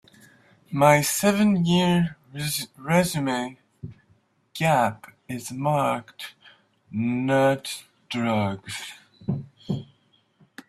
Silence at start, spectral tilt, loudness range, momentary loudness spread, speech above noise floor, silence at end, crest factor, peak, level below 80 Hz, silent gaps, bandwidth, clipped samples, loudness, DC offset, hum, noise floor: 0.7 s; -5 dB/octave; 6 LU; 19 LU; 41 dB; 0.85 s; 22 dB; -4 dBFS; -60 dBFS; none; 16 kHz; under 0.1%; -24 LUFS; under 0.1%; none; -64 dBFS